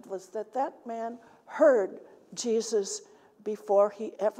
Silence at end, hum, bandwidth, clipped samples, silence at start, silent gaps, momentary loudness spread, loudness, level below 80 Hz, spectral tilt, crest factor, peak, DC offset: 0.05 s; none; 11 kHz; under 0.1%; 0.05 s; none; 18 LU; -29 LUFS; -88 dBFS; -3.5 dB/octave; 18 dB; -10 dBFS; under 0.1%